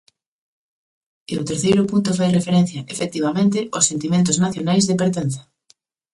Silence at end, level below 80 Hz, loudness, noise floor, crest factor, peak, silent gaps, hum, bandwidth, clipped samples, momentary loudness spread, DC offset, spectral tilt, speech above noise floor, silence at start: 0.7 s; -56 dBFS; -19 LUFS; -59 dBFS; 18 dB; -2 dBFS; none; none; 11.5 kHz; under 0.1%; 9 LU; under 0.1%; -5 dB/octave; 40 dB; 1.3 s